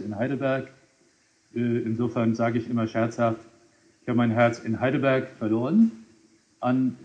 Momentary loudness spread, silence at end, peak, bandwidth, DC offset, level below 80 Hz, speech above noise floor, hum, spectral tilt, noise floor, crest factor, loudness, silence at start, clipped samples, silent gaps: 9 LU; 0 s; -8 dBFS; 7.8 kHz; under 0.1%; -70 dBFS; 39 dB; none; -8 dB/octave; -63 dBFS; 18 dB; -25 LUFS; 0 s; under 0.1%; none